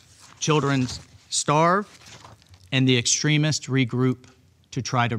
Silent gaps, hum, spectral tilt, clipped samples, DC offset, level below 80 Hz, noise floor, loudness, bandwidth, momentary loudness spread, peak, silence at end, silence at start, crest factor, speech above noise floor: none; none; -4 dB/octave; under 0.1%; under 0.1%; -58 dBFS; -49 dBFS; -22 LUFS; 12 kHz; 13 LU; -6 dBFS; 0 s; 0.4 s; 18 dB; 27 dB